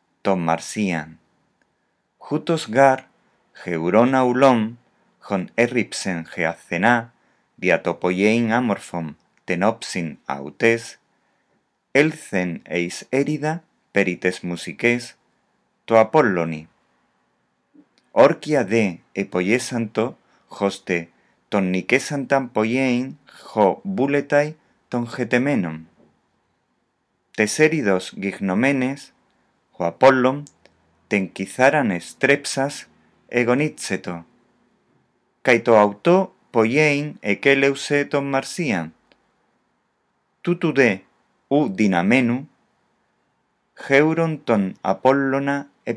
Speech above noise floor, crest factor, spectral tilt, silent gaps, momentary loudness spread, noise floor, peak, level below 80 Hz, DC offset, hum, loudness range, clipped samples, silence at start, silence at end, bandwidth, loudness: 51 dB; 22 dB; -5.5 dB/octave; none; 12 LU; -70 dBFS; 0 dBFS; -68 dBFS; under 0.1%; none; 4 LU; under 0.1%; 0.25 s; 0 s; 11 kHz; -20 LUFS